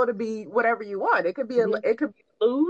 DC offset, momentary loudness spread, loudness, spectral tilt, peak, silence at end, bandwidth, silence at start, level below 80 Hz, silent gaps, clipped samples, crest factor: under 0.1%; 5 LU; -25 LUFS; -6.5 dB/octave; -10 dBFS; 0 s; 7.6 kHz; 0 s; -78 dBFS; none; under 0.1%; 16 dB